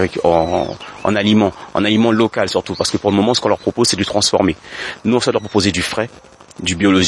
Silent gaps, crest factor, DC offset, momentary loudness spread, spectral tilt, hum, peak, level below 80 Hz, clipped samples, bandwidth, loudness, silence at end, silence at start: none; 16 dB; under 0.1%; 8 LU; -4.5 dB/octave; none; 0 dBFS; -48 dBFS; under 0.1%; 11.5 kHz; -16 LUFS; 0 s; 0 s